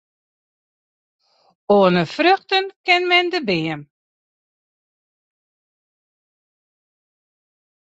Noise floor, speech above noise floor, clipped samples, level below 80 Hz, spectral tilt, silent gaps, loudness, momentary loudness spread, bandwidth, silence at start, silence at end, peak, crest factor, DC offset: under -90 dBFS; over 73 dB; under 0.1%; -66 dBFS; -5.5 dB/octave; 2.76-2.84 s; -17 LUFS; 8 LU; 8 kHz; 1.7 s; 4.1 s; -2 dBFS; 20 dB; under 0.1%